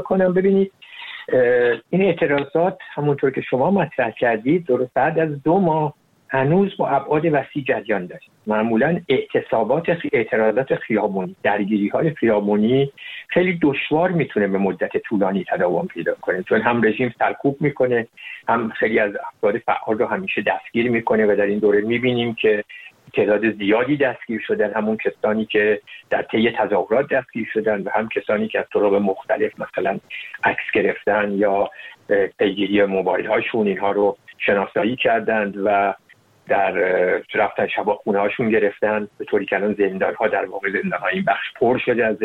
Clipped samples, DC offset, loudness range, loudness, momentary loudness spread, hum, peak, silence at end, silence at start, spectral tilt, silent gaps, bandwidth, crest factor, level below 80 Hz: under 0.1%; under 0.1%; 2 LU; -20 LUFS; 6 LU; none; -2 dBFS; 0 s; 0 s; -8.5 dB/octave; none; 4.3 kHz; 18 dB; -58 dBFS